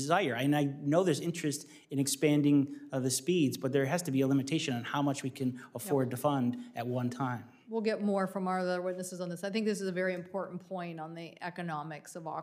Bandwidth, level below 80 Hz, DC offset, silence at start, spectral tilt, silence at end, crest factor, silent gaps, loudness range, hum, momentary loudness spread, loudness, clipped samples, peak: 15.5 kHz; -84 dBFS; under 0.1%; 0 s; -5.5 dB/octave; 0 s; 18 dB; none; 6 LU; none; 12 LU; -33 LUFS; under 0.1%; -14 dBFS